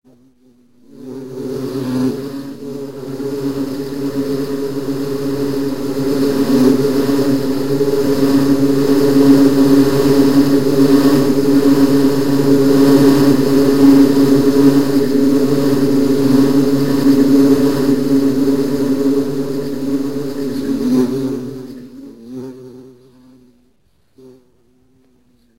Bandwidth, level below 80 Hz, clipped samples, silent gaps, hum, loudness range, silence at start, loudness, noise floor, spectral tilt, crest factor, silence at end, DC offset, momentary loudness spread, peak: 16 kHz; -44 dBFS; under 0.1%; none; none; 11 LU; 0 s; -13 LUFS; -59 dBFS; -6.5 dB/octave; 14 dB; 0 s; 4%; 15 LU; 0 dBFS